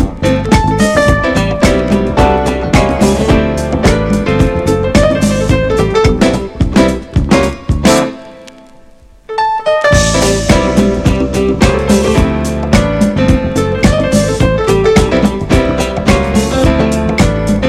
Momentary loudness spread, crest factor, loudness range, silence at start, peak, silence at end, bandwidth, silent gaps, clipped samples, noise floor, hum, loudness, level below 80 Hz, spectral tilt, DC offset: 4 LU; 10 dB; 2 LU; 0 s; 0 dBFS; 0 s; 15.5 kHz; none; 0.3%; -39 dBFS; none; -11 LUFS; -20 dBFS; -5.5 dB/octave; under 0.1%